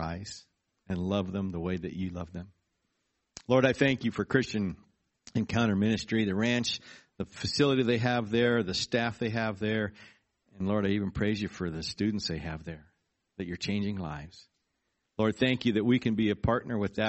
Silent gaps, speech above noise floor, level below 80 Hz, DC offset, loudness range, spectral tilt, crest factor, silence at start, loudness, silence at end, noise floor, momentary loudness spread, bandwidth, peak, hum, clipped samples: none; 51 dB; -54 dBFS; under 0.1%; 7 LU; -5.5 dB/octave; 22 dB; 0 s; -30 LUFS; 0 s; -80 dBFS; 15 LU; 8.2 kHz; -10 dBFS; none; under 0.1%